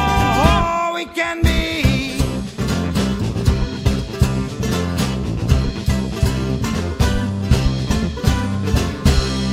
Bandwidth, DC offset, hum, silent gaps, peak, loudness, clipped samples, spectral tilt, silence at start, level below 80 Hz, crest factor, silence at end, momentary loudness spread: 16 kHz; under 0.1%; none; none; 0 dBFS; -19 LUFS; under 0.1%; -5.5 dB/octave; 0 s; -24 dBFS; 18 dB; 0 s; 5 LU